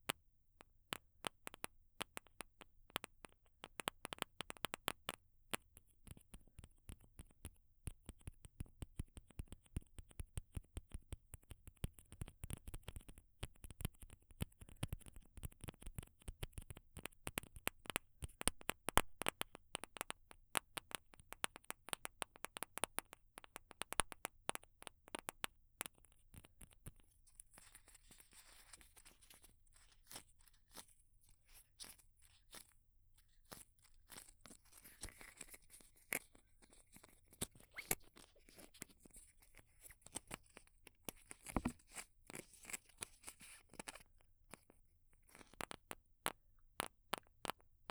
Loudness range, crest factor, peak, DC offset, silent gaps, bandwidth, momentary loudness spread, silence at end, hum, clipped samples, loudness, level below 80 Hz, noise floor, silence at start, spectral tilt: 16 LU; 40 dB; -12 dBFS; under 0.1%; none; over 20 kHz; 20 LU; 0.25 s; none; under 0.1%; -49 LUFS; -60 dBFS; -71 dBFS; 0.1 s; -2.5 dB/octave